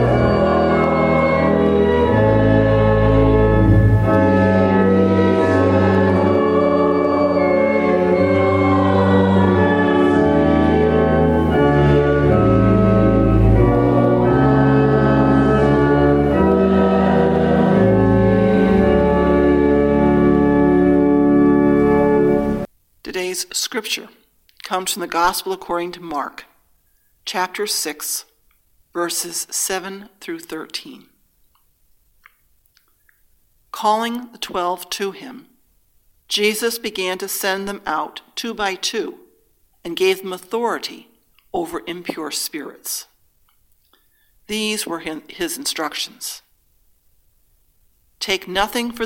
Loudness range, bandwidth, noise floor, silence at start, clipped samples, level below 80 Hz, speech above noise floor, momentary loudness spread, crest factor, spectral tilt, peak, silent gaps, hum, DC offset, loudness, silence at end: 12 LU; 17 kHz; -60 dBFS; 0 s; under 0.1%; -32 dBFS; 37 dB; 13 LU; 16 dB; -6 dB/octave; -2 dBFS; none; none; under 0.1%; -16 LUFS; 0 s